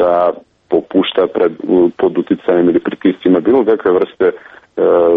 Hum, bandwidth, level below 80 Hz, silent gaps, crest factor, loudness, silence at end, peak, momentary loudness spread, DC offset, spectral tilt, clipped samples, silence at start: none; 4 kHz; -52 dBFS; none; 12 dB; -13 LUFS; 0 s; 0 dBFS; 5 LU; under 0.1%; -9 dB/octave; under 0.1%; 0 s